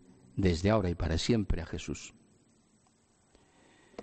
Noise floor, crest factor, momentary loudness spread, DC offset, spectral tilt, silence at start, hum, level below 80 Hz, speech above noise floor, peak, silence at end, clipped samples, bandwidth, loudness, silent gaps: -68 dBFS; 20 dB; 15 LU; under 0.1%; -6 dB/octave; 0.35 s; none; -44 dBFS; 38 dB; -14 dBFS; 0 s; under 0.1%; 8.8 kHz; -32 LUFS; none